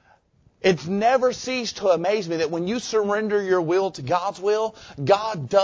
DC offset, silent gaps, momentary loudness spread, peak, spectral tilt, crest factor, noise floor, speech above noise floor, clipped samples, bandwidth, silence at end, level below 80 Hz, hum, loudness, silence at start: under 0.1%; none; 5 LU; -4 dBFS; -5 dB/octave; 18 dB; -59 dBFS; 37 dB; under 0.1%; 8 kHz; 0 s; -60 dBFS; none; -23 LUFS; 0.65 s